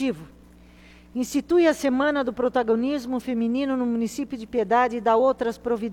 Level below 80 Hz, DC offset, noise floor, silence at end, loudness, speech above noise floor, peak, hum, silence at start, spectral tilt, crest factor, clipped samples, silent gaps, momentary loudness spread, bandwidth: -54 dBFS; under 0.1%; -49 dBFS; 0 s; -23 LUFS; 27 dB; -8 dBFS; none; 0 s; -5 dB/octave; 16 dB; under 0.1%; none; 9 LU; 16.5 kHz